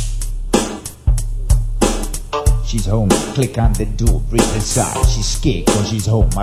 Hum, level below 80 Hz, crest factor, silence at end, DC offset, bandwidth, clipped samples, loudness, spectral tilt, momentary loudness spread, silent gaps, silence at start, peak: none; -18 dBFS; 16 dB; 0 s; under 0.1%; 16 kHz; under 0.1%; -18 LUFS; -5 dB/octave; 6 LU; none; 0 s; 0 dBFS